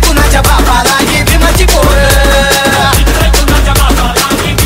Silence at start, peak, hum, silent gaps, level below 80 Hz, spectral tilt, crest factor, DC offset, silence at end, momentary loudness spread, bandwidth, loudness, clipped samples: 0 s; 0 dBFS; none; none; -10 dBFS; -3.5 dB/octave; 6 dB; under 0.1%; 0 s; 2 LU; 16.5 kHz; -7 LUFS; 0.6%